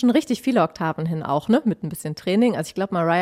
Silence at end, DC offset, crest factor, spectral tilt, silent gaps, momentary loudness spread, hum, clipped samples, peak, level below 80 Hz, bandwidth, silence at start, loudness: 0 s; under 0.1%; 16 dB; -6.5 dB/octave; none; 7 LU; none; under 0.1%; -6 dBFS; -60 dBFS; 15.5 kHz; 0 s; -22 LUFS